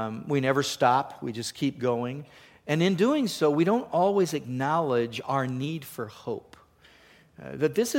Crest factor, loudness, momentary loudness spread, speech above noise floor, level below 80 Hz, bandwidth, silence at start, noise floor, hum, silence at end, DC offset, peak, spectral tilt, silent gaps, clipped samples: 18 dB; -27 LUFS; 13 LU; 30 dB; -68 dBFS; 17 kHz; 0 s; -57 dBFS; none; 0 s; under 0.1%; -8 dBFS; -5.5 dB/octave; none; under 0.1%